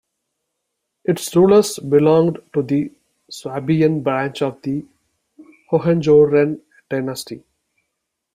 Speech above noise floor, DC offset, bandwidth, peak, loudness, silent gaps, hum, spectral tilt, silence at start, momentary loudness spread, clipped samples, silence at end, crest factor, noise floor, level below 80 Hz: 60 dB; under 0.1%; 16 kHz; -2 dBFS; -17 LUFS; none; none; -6.5 dB/octave; 1.1 s; 17 LU; under 0.1%; 0.95 s; 16 dB; -77 dBFS; -58 dBFS